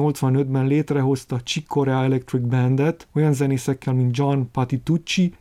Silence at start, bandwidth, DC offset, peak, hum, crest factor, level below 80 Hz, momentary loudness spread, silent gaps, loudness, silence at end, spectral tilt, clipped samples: 0 s; 14 kHz; under 0.1%; -6 dBFS; none; 14 dB; -54 dBFS; 4 LU; none; -21 LUFS; 0.1 s; -7 dB/octave; under 0.1%